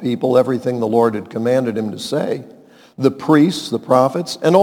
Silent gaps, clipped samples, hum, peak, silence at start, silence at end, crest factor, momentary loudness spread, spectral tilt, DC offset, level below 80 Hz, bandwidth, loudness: none; under 0.1%; none; 0 dBFS; 0 s; 0 s; 16 dB; 8 LU; -6.5 dB/octave; under 0.1%; -66 dBFS; 18 kHz; -17 LUFS